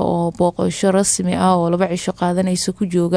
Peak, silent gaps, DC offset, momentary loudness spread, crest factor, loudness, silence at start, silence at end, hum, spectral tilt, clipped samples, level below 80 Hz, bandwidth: -4 dBFS; none; under 0.1%; 4 LU; 14 dB; -18 LUFS; 0 s; 0 s; none; -5 dB/octave; under 0.1%; -48 dBFS; 11 kHz